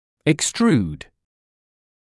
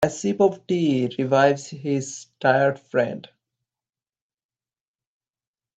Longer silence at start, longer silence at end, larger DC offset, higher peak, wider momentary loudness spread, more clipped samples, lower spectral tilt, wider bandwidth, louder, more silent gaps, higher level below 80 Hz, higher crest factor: first, 0.25 s vs 0 s; second, 1.15 s vs 2.5 s; neither; about the same, -6 dBFS vs -4 dBFS; first, 12 LU vs 9 LU; neither; about the same, -4.5 dB/octave vs -5.5 dB/octave; first, 12 kHz vs 9.2 kHz; about the same, -20 LUFS vs -22 LUFS; neither; first, -52 dBFS vs -64 dBFS; about the same, 18 dB vs 20 dB